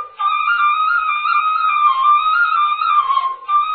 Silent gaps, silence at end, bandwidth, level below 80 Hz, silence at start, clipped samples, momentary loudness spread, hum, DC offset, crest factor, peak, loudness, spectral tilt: none; 0 s; 4.5 kHz; -66 dBFS; 0 s; under 0.1%; 5 LU; none; under 0.1%; 12 dB; -4 dBFS; -15 LUFS; -3 dB/octave